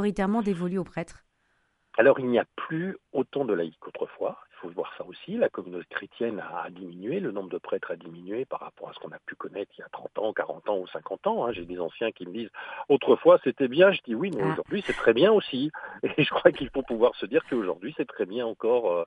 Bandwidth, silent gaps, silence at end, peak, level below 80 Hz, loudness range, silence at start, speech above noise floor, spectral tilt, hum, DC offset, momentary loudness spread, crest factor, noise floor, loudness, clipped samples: 10.5 kHz; none; 0 s; -2 dBFS; -60 dBFS; 11 LU; 0 s; 44 dB; -7 dB/octave; none; under 0.1%; 17 LU; 24 dB; -71 dBFS; -27 LUFS; under 0.1%